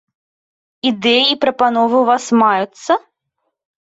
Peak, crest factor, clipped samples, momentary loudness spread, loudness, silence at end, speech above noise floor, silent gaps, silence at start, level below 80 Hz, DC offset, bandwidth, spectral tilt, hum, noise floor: -2 dBFS; 14 dB; under 0.1%; 7 LU; -14 LUFS; 0.85 s; 59 dB; none; 0.85 s; -64 dBFS; under 0.1%; 8 kHz; -3.5 dB/octave; none; -73 dBFS